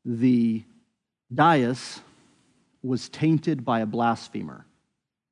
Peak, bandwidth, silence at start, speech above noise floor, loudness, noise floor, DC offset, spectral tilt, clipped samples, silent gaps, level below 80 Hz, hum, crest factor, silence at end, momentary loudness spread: -6 dBFS; 10.5 kHz; 0.05 s; 56 dB; -24 LUFS; -79 dBFS; under 0.1%; -6.5 dB/octave; under 0.1%; none; -72 dBFS; none; 20 dB; 0.75 s; 17 LU